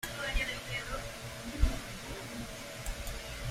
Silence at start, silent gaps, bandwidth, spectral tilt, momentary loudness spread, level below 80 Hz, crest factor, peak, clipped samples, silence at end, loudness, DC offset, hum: 0 s; none; 16 kHz; -3.5 dB/octave; 8 LU; -40 dBFS; 24 dB; -14 dBFS; under 0.1%; 0 s; -38 LUFS; under 0.1%; none